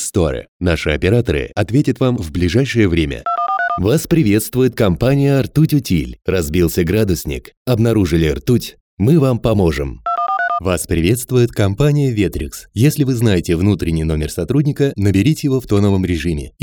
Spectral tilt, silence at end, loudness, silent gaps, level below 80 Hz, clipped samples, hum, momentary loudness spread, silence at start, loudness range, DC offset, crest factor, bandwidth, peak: -6.5 dB/octave; 0.15 s; -16 LUFS; 0.48-0.60 s, 7.57-7.65 s, 8.80-8.97 s; -32 dBFS; under 0.1%; none; 5 LU; 0 s; 1 LU; under 0.1%; 14 dB; over 20 kHz; -2 dBFS